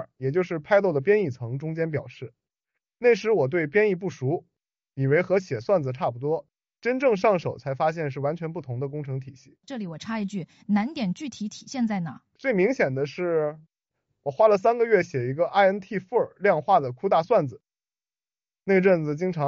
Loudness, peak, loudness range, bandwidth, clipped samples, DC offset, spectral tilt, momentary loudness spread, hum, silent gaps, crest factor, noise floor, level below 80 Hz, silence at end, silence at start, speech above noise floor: -25 LUFS; -6 dBFS; 7 LU; 7.6 kHz; under 0.1%; under 0.1%; -6 dB/octave; 13 LU; none; none; 18 dB; under -90 dBFS; -68 dBFS; 0 s; 0 s; over 66 dB